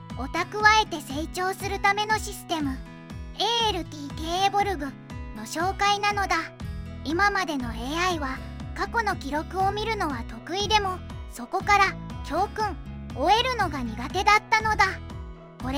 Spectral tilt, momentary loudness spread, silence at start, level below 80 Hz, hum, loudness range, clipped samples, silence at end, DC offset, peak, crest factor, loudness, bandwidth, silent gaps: -3.5 dB/octave; 16 LU; 0 s; -42 dBFS; none; 4 LU; under 0.1%; 0 s; under 0.1%; -4 dBFS; 22 dB; -25 LUFS; 16.5 kHz; none